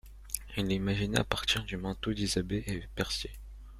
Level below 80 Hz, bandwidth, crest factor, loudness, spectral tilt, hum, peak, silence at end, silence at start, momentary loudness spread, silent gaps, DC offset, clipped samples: -46 dBFS; 16 kHz; 28 dB; -33 LUFS; -4 dB/octave; none; -6 dBFS; 0 s; 0.05 s; 9 LU; none; under 0.1%; under 0.1%